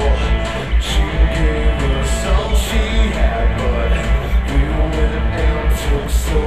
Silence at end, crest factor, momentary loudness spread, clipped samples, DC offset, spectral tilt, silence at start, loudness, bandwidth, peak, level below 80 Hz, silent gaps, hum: 0 s; 12 dB; 2 LU; under 0.1%; 2%; -5.5 dB/octave; 0 s; -18 LUFS; 13.5 kHz; -2 dBFS; -16 dBFS; none; none